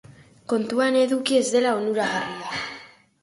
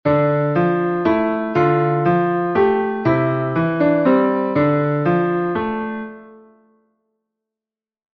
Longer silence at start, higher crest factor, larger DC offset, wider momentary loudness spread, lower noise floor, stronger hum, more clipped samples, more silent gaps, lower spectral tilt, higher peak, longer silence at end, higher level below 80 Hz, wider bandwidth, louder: about the same, 0.1 s vs 0.05 s; about the same, 16 dB vs 14 dB; neither; first, 12 LU vs 5 LU; second, -45 dBFS vs -90 dBFS; neither; neither; neither; second, -3.5 dB/octave vs -10 dB/octave; second, -8 dBFS vs -4 dBFS; second, 0.35 s vs 1.8 s; second, -66 dBFS vs -52 dBFS; first, 11.5 kHz vs 5.8 kHz; second, -23 LUFS vs -18 LUFS